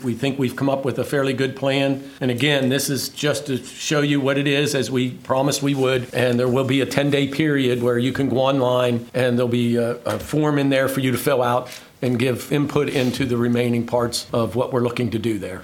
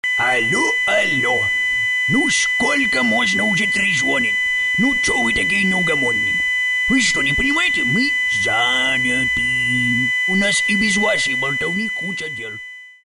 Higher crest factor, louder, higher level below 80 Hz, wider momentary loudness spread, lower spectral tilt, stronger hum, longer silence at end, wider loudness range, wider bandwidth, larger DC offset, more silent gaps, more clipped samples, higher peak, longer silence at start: first, 20 dB vs 12 dB; second, -20 LUFS vs -16 LUFS; second, -54 dBFS vs -44 dBFS; about the same, 5 LU vs 4 LU; first, -5.5 dB/octave vs -2.5 dB/octave; neither; second, 0 s vs 0.15 s; about the same, 2 LU vs 1 LU; first, 17.5 kHz vs 12.5 kHz; neither; neither; neither; first, 0 dBFS vs -6 dBFS; about the same, 0 s vs 0.05 s